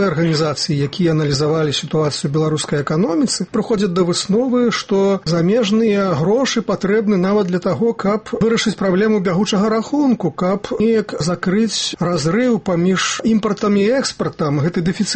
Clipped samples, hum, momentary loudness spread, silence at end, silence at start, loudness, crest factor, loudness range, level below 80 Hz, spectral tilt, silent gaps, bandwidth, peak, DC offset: under 0.1%; none; 4 LU; 0 s; 0 s; -17 LUFS; 12 dB; 1 LU; -48 dBFS; -5.5 dB/octave; none; 8.8 kHz; -4 dBFS; under 0.1%